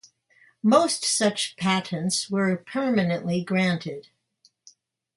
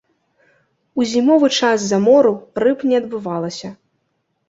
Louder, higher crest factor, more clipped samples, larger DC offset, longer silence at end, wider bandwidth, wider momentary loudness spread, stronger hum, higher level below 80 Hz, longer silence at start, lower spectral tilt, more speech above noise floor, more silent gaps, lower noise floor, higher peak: second, -24 LUFS vs -16 LUFS; about the same, 20 dB vs 16 dB; neither; neither; first, 1.15 s vs 0.75 s; first, 11.5 kHz vs 8 kHz; second, 7 LU vs 14 LU; neither; second, -68 dBFS vs -62 dBFS; second, 0.65 s vs 0.95 s; about the same, -4 dB/octave vs -4.5 dB/octave; second, 41 dB vs 54 dB; neither; second, -65 dBFS vs -69 dBFS; second, -6 dBFS vs -2 dBFS